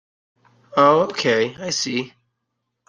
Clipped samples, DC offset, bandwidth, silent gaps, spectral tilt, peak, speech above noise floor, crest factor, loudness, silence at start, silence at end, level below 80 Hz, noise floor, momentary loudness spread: under 0.1%; under 0.1%; 10 kHz; none; -3.5 dB/octave; -2 dBFS; 58 dB; 20 dB; -19 LUFS; 0.75 s; 0.8 s; -66 dBFS; -77 dBFS; 10 LU